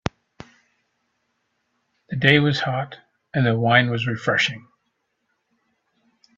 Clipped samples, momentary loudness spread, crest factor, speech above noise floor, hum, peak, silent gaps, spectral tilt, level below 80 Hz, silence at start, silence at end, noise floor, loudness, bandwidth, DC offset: under 0.1%; 16 LU; 24 dB; 54 dB; none; 0 dBFS; none; -6 dB/octave; -56 dBFS; 2.1 s; 1.75 s; -73 dBFS; -20 LUFS; 7.8 kHz; under 0.1%